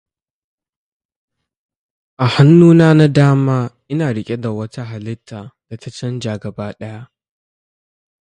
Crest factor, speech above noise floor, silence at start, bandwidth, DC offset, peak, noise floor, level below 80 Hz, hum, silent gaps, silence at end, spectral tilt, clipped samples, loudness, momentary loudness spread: 16 dB; over 76 dB; 2.2 s; 9.6 kHz; under 0.1%; 0 dBFS; under -90 dBFS; -54 dBFS; none; none; 1.25 s; -8 dB/octave; under 0.1%; -13 LUFS; 23 LU